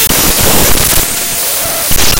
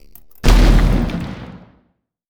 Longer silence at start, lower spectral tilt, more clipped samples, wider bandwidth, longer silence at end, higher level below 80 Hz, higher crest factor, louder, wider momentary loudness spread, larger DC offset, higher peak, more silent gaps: second, 0 s vs 0.45 s; second, -2 dB/octave vs -6 dB/octave; first, 1% vs under 0.1%; first, over 20 kHz vs 15 kHz; second, 0 s vs 0.75 s; about the same, -20 dBFS vs -16 dBFS; second, 10 dB vs 16 dB; first, -8 LUFS vs -16 LUFS; second, 4 LU vs 19 LU; neither; about the same, 0 dBFS vs 0 dBFS; neither